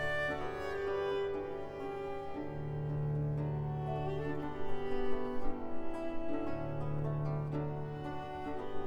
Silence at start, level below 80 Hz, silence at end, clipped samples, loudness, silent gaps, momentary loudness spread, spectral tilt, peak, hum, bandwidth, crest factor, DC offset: 0 s; -48 dBFS; 0 s; under 0.1%; -39 LUFS; none; 6 LU; -8 dB/octave; -20 dBFS; none; 8.2 kHz; 14 dB; under 0.1%